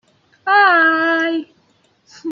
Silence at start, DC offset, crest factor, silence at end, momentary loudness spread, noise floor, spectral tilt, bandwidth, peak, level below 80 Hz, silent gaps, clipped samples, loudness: 0.45 s; under 0.1%; 16 dB; 0 s; 16 LU; -58 dBFS; -3 dB/octave; 7.2 kHz; -2 dBFS; -74 dBFS; none; under 0.1%; -14 LUFS